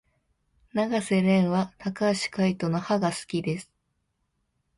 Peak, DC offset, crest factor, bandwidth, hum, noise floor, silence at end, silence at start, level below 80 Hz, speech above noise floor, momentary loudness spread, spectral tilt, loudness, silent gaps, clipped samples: -10 dBFS; under 0.1%; 18 dB; 11.5 kHz; none; -76 dBFS; 1.15 s; 0.75 s; -64 dBFS; 50 dB; 10 LU; -6 dB/octave; -26 LUFS; none; under 0.1%